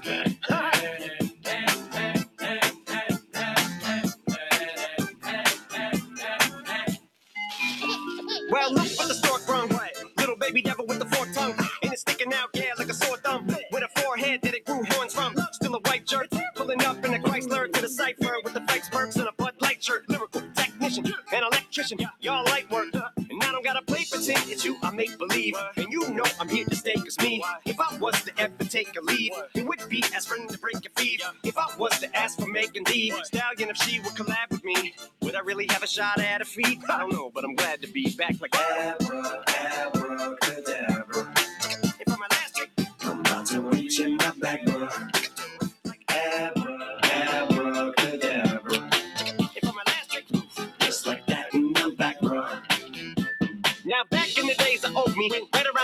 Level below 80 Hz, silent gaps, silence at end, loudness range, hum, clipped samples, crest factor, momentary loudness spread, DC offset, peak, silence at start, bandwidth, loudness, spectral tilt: -64 dBFS; none; 0 s; 2 LU; none; under 0.1%; 20 dB; 7 LU; under 0.1%; -8 dBFS; 0 s; over 20 kHz; -26 LUFS; -3 dB/octave